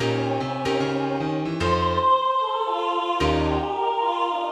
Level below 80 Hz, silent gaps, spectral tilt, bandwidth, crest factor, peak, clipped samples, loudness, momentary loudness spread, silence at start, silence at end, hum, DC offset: -40 dBFS; none; -6 dB/octave; 12.5 kHz; 12 dB; -10 dBFS; under 0.1%; -23 LUFS; 6 LU; 0 s; 0 s; none; under 0.1%